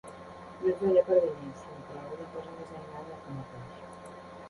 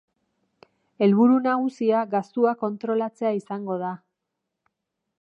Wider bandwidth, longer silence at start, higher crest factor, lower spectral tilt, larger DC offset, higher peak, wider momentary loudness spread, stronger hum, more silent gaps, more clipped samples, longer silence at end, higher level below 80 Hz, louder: first, 11.5 kHz vs 7.8 kHz; second, 0.05 s vs 1 s; about the same, 20 dB vs 18 dB; about the same, -7.5 dB/octave vs -8.5 dB/octave; neither; second, -12 dBFS vs -8 dBFS; first, 21 LU vs 11 LU; neither; neither; neither; second, 0 s vs 1.25 s; first, -64 dBFS vs -84 dBFS; second, -30 LUFS vs -23 LUFS